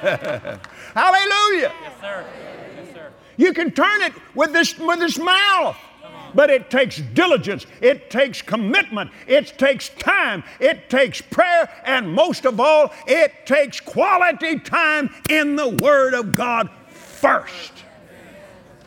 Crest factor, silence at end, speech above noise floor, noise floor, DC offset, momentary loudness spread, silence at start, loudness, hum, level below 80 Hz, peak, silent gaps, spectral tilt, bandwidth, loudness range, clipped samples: 18 dB; 0.4 s; 26 dB; -44 dBFS; under 0.1%; 15 LU; 0 s; -18 LUFS; none; -58 dBFS; -2 dBFS; none; -4 dB/octave; 17.5 kHz; 3 LU; under 0.1%